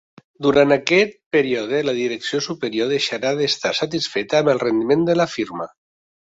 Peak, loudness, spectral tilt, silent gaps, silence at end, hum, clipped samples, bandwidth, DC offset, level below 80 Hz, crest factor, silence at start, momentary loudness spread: 0 dBFS; -19 LUFS; -4.5 dB/octave; 1.26-1.31 s; 0.65 s; none; under 0.1%; 8 kHz; under 0.1%; -58 dBFS; 20 dB; 0.4 s; 8 LU